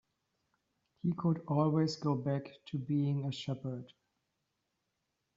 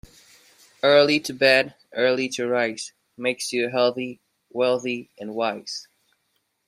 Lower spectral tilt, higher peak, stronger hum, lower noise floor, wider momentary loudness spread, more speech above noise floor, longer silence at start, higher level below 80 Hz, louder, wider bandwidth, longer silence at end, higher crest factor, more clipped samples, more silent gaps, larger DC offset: first, -7.5 dB/octave vs -3.5 dB/octave; second, -18 dBFS vs -2 dBFS; neither; first, -84 dBFS vs -72 dBFS; second, 11 LU vs 16 LU; about the same, 50 dB vs 50 dB; first, 1.05 s vs 0.85 s; second, -74 dBFS vs -66 dBFS; second, -35 LUFS vs -22 LUFS; second, 7.6 kHz vs 14 kHz; first, 1.5 s vs 0.85 s; about the same, 18 dB vs 22 dB; neither; neither; neither